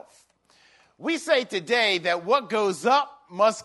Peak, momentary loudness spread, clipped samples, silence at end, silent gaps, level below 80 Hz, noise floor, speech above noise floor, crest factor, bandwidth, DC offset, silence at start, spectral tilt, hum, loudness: -6 dBFS; 7 LU; under 0.1%; 0 s; none; -78 dBFS; -60 dBFS; 37 dB; 18 dB; 11.5 kHz; under 0.1%; 1 s; -3 dB/octave; none; -24 LUFS